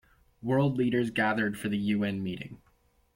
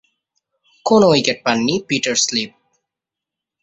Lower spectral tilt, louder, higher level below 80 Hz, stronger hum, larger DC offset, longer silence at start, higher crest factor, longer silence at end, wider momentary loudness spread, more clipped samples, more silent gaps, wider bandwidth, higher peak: first, -7 dB/octave vs -3.5 dB/octave; second, -29 LUFS vs -16 LUFS; about the same, -60 dBFS vs -58 dBFS; neither; neither; second, 0.45 s vs 0.85 s; about the same, 14 dB vs 18 dB; second, 0.6 s vs 1.15 s; about the same, 12 LU vs 11 LU; neither; neither; first, 16.5 kHz vs 8.2 kHz; second, -16 dBFS vs -2 dBFS